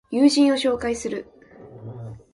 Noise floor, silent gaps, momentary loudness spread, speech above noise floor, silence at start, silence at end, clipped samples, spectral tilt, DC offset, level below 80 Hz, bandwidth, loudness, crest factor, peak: -44 dBFS; none; 22 LU; 24 dB; 0.1 s; 0.15 s; under 0.1%; -4.5 dB/octave; under 0.1%; -54 dBFS; 11.5 kHz; -20 LUFS; 16 dB; -6 dBFS